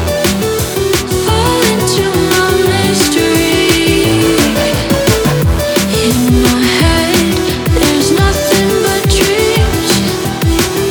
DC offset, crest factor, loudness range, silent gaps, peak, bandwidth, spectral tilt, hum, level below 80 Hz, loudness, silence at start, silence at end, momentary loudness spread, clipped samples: under 0.1%; 10 dB; 1 LU; none; 0 dBFS; over 20 kHz; -4.5 dB/octave; none; -22 dBFS; -11 LUFS; 0 s; 0 s; 3 LU; under 0.1%